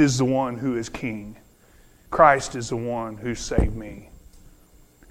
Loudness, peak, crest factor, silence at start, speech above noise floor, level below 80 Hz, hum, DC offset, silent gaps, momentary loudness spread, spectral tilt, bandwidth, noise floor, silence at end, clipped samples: -23 LUFS; -2 dBFS; 24 dB; 0 s; 31 dB; -36 dBFS; none; under 0.1%; none; 20 LU; -5.5 dB/octave; 16 kHz; -54 dBFS; 0.6 s; under 0.1%